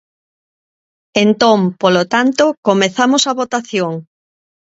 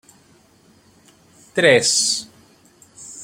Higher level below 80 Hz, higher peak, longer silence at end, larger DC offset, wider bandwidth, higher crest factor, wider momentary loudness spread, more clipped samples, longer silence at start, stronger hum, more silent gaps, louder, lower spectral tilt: about the same, -62 dBFS vs -64 dBFS; about the same, 0 dBFS vs -2 dBFS; first, 0.65 s vs 0 s; neither; second, 8.2 kHz vs 16.5 kHz; second, 16 dB vs 22 dB; second, 8 LU vs 23 LU; neither; second, 1.15 s vs 1.55 s; neither; first, 2.57-2.63 s vs none; about the same, -14 LUFS vs -16 LUFS; first, -4 dB/octave vs -1.5 dB/octave